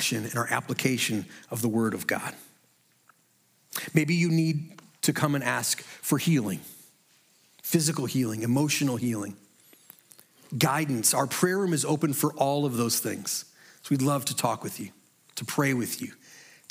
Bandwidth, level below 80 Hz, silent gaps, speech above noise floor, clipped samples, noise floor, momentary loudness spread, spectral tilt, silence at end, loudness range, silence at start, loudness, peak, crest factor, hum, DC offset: 16.5 kHz; -76 dBFS; none; 39 dB; under 0.1%; -66 dBFS; 13 LU; -4.5 dB/octave; 0.25 s; 4 LU; 0 s; -27 LUFS; -6 dBFS; 22 dB; none; under 0.1%